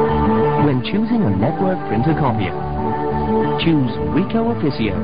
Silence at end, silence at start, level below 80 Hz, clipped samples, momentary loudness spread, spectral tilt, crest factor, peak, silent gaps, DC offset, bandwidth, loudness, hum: 0 s; 0 s; -34 dBFS; under 0.1%; 5 LU; -12.5 dB/octave; 12 dB; -4 dBFS; none; 3%; 5.2 kHz; -18 LUFS; none